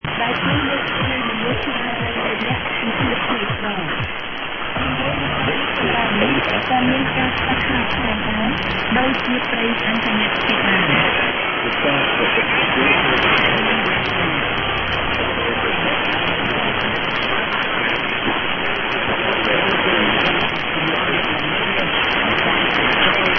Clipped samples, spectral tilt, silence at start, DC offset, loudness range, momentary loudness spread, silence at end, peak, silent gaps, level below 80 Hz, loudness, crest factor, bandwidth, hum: under 0.1%; -6.5 dB/octave; 0.05 s; under 0.1%; 4 LU; 6 LU; 0 s; 0 dBFS; none; -40 dBFS; -17 LUFS; 18 dB; 6.4 kHz; none